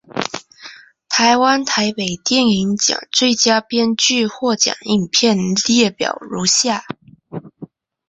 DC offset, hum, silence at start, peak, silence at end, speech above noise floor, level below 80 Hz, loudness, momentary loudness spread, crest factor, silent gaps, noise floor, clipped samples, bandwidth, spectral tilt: under 0.1%; none; 0.15 s; 0 dBFS; 0.45 s; 24 dB; -56 dBFS; -15 LUFS; 13 LU; 16 dB; none; -40 dBFS; under 0.1%; 8.4 kHz; -2.5 dB/octave